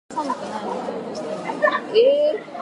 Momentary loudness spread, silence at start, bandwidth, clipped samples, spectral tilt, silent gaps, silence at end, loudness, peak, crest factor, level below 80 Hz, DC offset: 12 LU; 0.1 s; 11 kHz; under 0.1%; -4.5 dB/octave; none; 0 s; -22 LUFS; -4 dBFS; 18 dB; -74 dBFS; under 0.1%